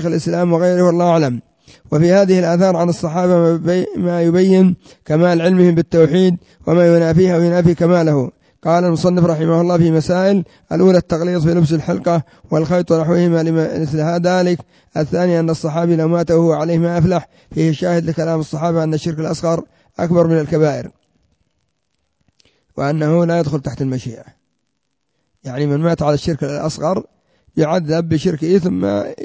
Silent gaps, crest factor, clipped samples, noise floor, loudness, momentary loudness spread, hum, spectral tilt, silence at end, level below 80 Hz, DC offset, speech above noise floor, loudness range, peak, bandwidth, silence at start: none; 14 dB; under 0.1%; -72 dBFS; -15 LUFS; 9 LU; none; -7.5 dB/octave; 0 s; -46 dBFS; under 0.1%; 57 dB; 7 LU; 0 dBFS; 8 kHz; 0 s